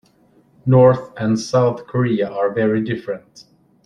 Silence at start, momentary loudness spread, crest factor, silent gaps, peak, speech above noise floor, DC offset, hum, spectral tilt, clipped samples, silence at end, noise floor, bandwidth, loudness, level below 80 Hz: 0.65 s; 14 LU; 16 dB; none; -2 dBFS; 38 dB; under 0.1%; none; -7.5 dB/octave; under 0.1%; 0.45 s; -55 dBFS; 10 kHz; -18 LUFS; -56 dBFS